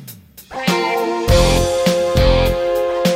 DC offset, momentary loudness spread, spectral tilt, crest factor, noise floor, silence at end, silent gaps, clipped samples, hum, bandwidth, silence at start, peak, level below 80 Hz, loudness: under 0.1%; 7 LU; -5 dB/octave; 14 dB; -38 dBFS; 0 s; none; under 0.1%; none; 16.5 kHz; 0 s; 0 dBFS; -22 dBFS; -16 LUFS